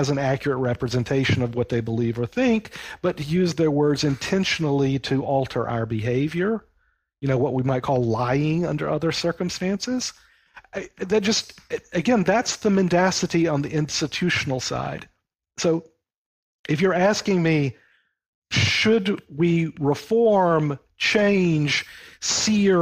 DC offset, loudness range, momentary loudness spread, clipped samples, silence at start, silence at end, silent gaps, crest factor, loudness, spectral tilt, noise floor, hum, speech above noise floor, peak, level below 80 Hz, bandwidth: under 0.1%; 4 LU; 9 LU; under 0.1%; 0 s; 0 s; 16.16-16.64 s, 18.28-18.42 s; 14 dB; -22 LUFS; -5 dB/octave; -67 dBFS; none; 46 dB; -8 dBFS; -52 dBFS; 15.5 kHz